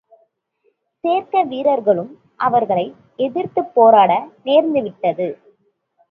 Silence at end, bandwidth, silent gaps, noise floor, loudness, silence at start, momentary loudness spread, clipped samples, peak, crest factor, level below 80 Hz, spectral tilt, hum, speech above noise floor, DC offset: 0.75 s; 4.5 kHz; none; -65 dBFS; -17 LUFS; 1.05 s; 13 LU; under 0.1%; 0 dBFS; 18 dB; -68 dBFS; -9 dB/octave; none; 49 dB; under 0.1%